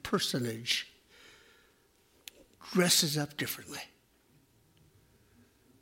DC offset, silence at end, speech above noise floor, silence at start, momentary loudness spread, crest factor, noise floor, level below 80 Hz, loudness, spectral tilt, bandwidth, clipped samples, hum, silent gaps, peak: under 0.1%; 1.95 s; 36 dB; 0.05 s; 26 LU; 26 dB; -67 dBFS; -70 dBFS; -30 LUFS; -3 dB/octave; 16.5 kHz; under 0.1%; none; none; -10 dBFS